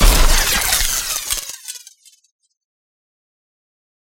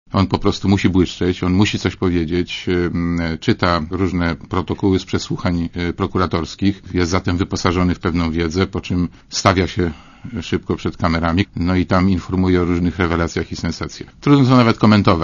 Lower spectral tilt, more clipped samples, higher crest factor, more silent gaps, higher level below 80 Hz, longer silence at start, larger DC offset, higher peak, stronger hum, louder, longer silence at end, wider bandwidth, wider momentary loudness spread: second, -1.5 dB/octave vs -6.5 dB/octave; neither; about the same, 18 dB vs 18 dB; neither; first, -20 dBFS vs -36 dBFS; about the same, 0 s vs 0.1 s; neither; about the same, 0 dBFS vs 0 dBFS; neither; about the same, -16 LUFS vs -18 LUFS; first, 2.25 s vs 0 s; first, 17.5 kHz vs 7.4 kHz; first, 17 LU vs 8 LU